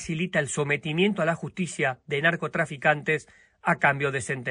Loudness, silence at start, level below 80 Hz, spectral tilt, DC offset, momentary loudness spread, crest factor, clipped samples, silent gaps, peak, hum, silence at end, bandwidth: -26 LUFS; 0 s; -62 dBFS; -5 dB/octave; under 0.1%; 6 LU; 20 dB; under 0.1%; none; -6 dBFS; none; 0 s; 10.5 kHz